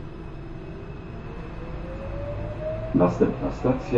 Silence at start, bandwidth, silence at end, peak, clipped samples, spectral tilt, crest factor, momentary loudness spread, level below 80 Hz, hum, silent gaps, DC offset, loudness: 0 s; 7.8 kHz; 0 s; -8 dBFS; under 0.1%; -9 dB/octave; 20 dB; 16 LU; -38 dBFS; none; none; under 0.1%; -28 LUFS